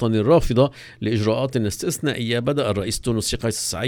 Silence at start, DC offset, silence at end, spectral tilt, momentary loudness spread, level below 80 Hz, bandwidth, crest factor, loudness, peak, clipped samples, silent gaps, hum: 0 s; under 0.1%; 0 s; -5 dB/octave; 7 LU; -36 dBFS; 19 kHz; 18 dB; -21 LUFS; -4 dBFS; under 0.1%; none; none